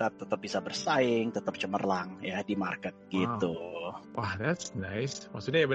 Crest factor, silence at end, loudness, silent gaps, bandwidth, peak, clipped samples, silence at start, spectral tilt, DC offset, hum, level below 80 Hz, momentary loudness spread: 18 dB; 0 s; -33 LUFS; none; 8.4 kHz; -14 dBFS; under 0.1%; 0 s; -5 dB/octave; under 0.1%; none; -68 dBFS; 9 LU